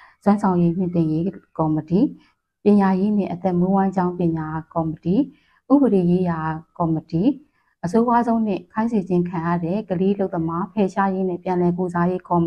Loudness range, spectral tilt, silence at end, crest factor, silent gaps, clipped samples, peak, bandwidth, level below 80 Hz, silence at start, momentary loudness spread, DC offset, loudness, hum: 2 LU; -9.5 dB/octave; 0 s; 16 dB; none; under 0.1%; -4 dBFS; 8.4 kHz; -54 dBFS; 0.25 s; 7 LU; under 0.1%; -21 LUFS; none